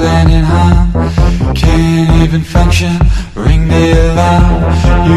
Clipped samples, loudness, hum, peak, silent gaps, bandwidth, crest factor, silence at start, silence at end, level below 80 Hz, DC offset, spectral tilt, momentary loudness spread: 1%; -10 LUFS; none; 0 dBFS; none; 12.5 kHz; 8 dB; 0 s; 0 s; -12 dBFS; under 0.1%; -7 dB/octave; 3 LU